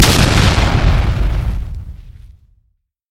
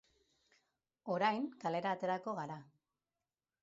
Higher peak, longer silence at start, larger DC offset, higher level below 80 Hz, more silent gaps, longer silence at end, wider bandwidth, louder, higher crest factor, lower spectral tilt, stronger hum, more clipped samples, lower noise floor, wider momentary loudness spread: first, 0 dBFS vs -20 dBFS; second, 0 s vs 1.05 s; neither; first, -18 dBFS vs -88 dBFS; neither; second, 0.85 s vs 1 s; first, 16.5 kHz vs 7.6 kHz; first, -14 LUFS vs -38 LUFS; second, 14 dB vs 22 dB; about the same, -4.5 dB/octave vs -4 dB/octave; neither; neither; second, -63 dBFS vs under -90 dBFS; first, 18 LU vs 13 LU